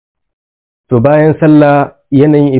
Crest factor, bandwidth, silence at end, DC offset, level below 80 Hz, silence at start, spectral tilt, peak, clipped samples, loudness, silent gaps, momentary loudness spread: 8 dB; 4 kHz; 0 s; under 0.1%; -44 dBFS; 0.9 s; -12.5 dB/octave; 0 dBFS; 2%; -8 LUFS; none; 6 LU